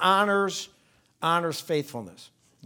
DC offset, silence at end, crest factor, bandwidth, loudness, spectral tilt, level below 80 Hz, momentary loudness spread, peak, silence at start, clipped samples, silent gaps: under 0.1%; 0.4 s; 20 dB; 19.5 kHz; -26 LUFS; -4 dB/octave; -76 dBFS; 18 LU; -6 dBFS; 0 s; under 0.1%; none